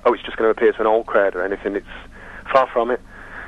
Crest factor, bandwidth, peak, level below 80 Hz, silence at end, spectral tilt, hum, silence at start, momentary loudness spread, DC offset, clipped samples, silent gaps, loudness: 18 dB; 7.4 kHz; -2 dBFS; -44 dBFS; 0 s; -6 dB/octave; none; 0.05 s; 20 LU; under 0.1%; under 0.1%; none; -19 LUFS